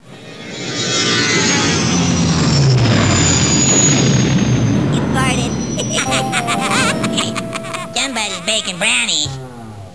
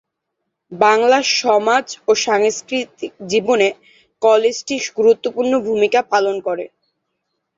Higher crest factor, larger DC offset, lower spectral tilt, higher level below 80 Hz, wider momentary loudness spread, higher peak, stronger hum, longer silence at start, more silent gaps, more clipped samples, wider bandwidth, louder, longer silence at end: about the same, 14 dB vs 16 dB; first, 0.6% vs under 0.1%; about the same, -3.5 dB/octave vs -2.5 dB/octave; first, -36 dBFS vs -64 dBFS; about the same, 11 LU vs 9 LU; about the same, -2 dBFS vs 0 dBFS; neither; second, 0.05 s vs 0.7 s; neither; neither; first, 11 kHz vs 7.8 kHz; about the same, -14 LUFS vs -16 LUFS; second, 0 s vs 0.9 s